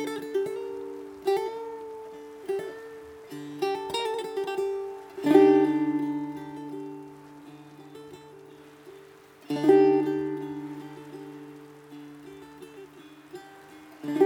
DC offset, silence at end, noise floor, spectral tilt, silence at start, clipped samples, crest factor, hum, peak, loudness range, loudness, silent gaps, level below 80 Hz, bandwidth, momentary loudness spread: under 0.1%; 0 s; -51 dBFS; -6 dB/octave; 0 s; under 0.1%; 22 dB; none; -6 dBFS; 17 LU; -27 LUFS; none; -72 dBFS; 16.5 kHz; 27 LU